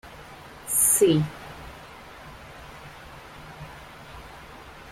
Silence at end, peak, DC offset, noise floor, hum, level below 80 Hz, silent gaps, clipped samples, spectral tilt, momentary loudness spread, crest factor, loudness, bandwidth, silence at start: 0 s; -8 dBFS; under 0.1%; -44 dBFS; none; -52 dBFS; none; under 0.1%; -4 dB/octave; 25 LU; 20 dB; -20 LUFS; 16.5 kHz; 0.05 s